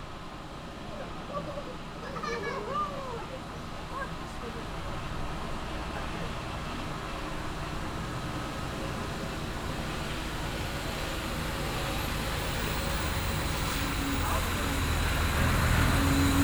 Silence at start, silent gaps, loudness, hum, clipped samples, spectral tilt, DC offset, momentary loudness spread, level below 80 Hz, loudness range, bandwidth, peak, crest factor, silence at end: 0 s; none; -33 LUFS; none; under 0.1%; -4.5 dB/octave; under 0.1%; 12 LU; -38 dBFS; 7 LU; over 20 kHz; -12 dBFS; 18 dB; 0 s